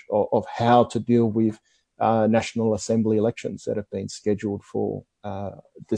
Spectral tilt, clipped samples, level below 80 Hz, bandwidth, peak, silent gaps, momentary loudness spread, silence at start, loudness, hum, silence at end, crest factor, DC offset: -6.5 dB/octave; under 0.1%; -60 dBFS; 9.6 kHz; -4 dBFS; none; 14 LU; 0.1 s; -23 LUFS; none; 0 s; 20 dB; under 0.1%